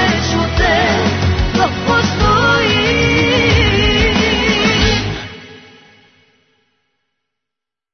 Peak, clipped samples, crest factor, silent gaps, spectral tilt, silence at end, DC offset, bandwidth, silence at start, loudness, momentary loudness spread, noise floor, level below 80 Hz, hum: -2 dBFS; under 0.1%; 14 dB; none; -4.5 dB/octave; 2.35 s; under 0.1%; 6.6 kHz; 0 s; -13 LUFS; 4 LU; -84 dBFS; -26 dBFS; none